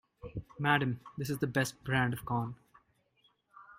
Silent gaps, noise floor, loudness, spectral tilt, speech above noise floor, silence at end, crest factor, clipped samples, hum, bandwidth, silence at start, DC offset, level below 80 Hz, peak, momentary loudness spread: none; -72 dBFS; -33 LUFS; -5.5 dB/octave; 40 dB; 0.05 s; 22 dB; under 0.1%; none; 16.5 kHz; 0.25 s; under 0.1%; -60 dBFS; -12 dBFS; 16 LU